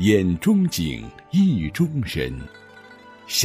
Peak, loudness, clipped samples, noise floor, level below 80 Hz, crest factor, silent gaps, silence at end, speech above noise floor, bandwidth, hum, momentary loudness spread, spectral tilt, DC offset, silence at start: -4 dBFS; -22 LUFS; under 0.1%; -45 dBFS; -44 dBFS; 16 dB; none; 0 s; 25 dB; 16 kHz; none; 13 LU; -5 dB/octave; under 0.1%; 0 s